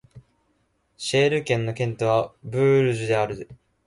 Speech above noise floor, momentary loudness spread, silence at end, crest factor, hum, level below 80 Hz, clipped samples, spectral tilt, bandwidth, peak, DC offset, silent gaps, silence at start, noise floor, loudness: 46 dB; 11 LU; 0.35 s; 16 dB; none; -58 dBFS; under 0.1%; -5.5 dB/octave; 11.5 kHz; -8 dBFS; under 0.1%; none; 0.15 s; -68 dBFS; -23 LUFS